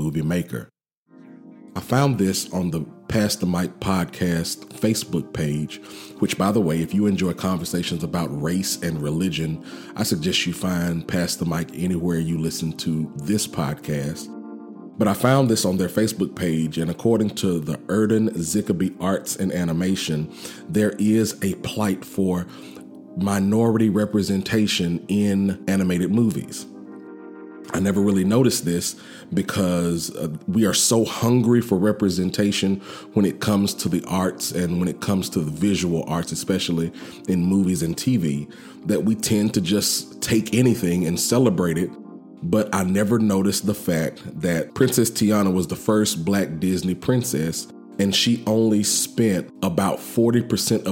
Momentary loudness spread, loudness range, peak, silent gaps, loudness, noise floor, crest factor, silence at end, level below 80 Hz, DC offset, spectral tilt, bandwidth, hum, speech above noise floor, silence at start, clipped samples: 10 LU; 4 LU; -2 dBFS; 0.97-1.06 s; -22 LUFS; -51 dBFS; 20 dB; 0 s; -52 dBFS; under 0.1%; -5 dB/octave; 17 kHz; none; 30 dB; 0 s; under 0.1%